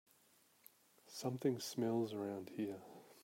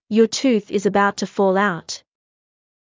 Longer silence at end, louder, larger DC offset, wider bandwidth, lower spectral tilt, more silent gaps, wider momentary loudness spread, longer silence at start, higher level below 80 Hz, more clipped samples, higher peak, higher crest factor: second, 0 s vs 0.95 s; second, -42 LUFS vs -19 LUFS; neither; first, 16 kHz vs 7.6 kHz; about the same, -5.5 dB/octave vs -4.5 dB/octave; neither; first, 15 LU vs 12 LU; first, 1.05 s vs 0.1 s; second, -88 dBFS vs -64 dBFS; neither; second, -26 dBFS vs -4 dBFS; about the same, 18 dB vs 16 dB